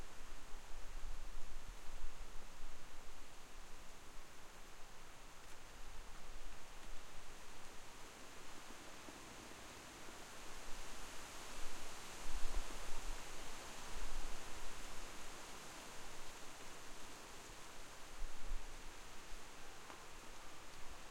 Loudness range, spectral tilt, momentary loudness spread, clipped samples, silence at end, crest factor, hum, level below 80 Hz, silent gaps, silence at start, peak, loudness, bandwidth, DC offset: 7 LU; -2.5 dB/octave; 8 LU; under 0.1%; 0 s; 18 dB; none; -50 dBFS; none; 0 s; -22 dBFS; -54 LUFS; 15.5 kHz; under 0.1%